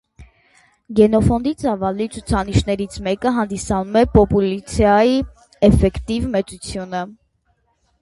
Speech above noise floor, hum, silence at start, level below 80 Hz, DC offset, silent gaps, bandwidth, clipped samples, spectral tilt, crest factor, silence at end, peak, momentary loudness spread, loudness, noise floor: 47 dB; none; 0.2 s; -30 dBFS; under 0.1%; none; 11.5 kHz; under 0.1%; -6.5 dB/octave; 18 dB; 0.9 s; 0 dBFS; 12 LU; -18 LUFS; -64 dBFS